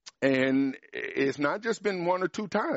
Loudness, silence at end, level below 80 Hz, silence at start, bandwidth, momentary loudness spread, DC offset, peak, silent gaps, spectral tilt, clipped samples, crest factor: -28 LUFS; 0 s; -72 dBFS; 0.05 s; 8 kHz; 6 LU; under 0.1%; -12 dBFS; none; -4 dB/octave; under 0.1%; 16 dB